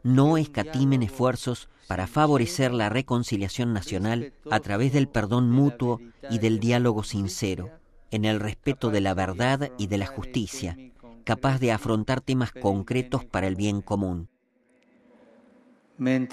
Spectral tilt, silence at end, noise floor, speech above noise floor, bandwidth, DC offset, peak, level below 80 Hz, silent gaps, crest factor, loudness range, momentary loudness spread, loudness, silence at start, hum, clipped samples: -6.5 dB/octave; 0 s; -66 dBFS; 41 dB; 14 kHz; under 0.1%; -8 dBFS; -48 dBFS; none; 18 dB; 4 LU; 10 LU; -26 LUFS; 0.05 s; none; under 0.1%